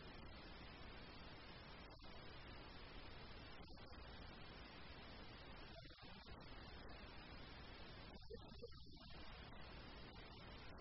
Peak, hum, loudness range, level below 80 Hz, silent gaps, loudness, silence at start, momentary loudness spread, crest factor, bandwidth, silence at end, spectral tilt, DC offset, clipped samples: -44 dBFS; none; 0 LU; -62 dBFS; none; -59 LUFS; 0 s; 1 LU; 14 dB; 5.8 kHz; 0 s; -3.5 dB/octave; under 0.1%; under 0.1%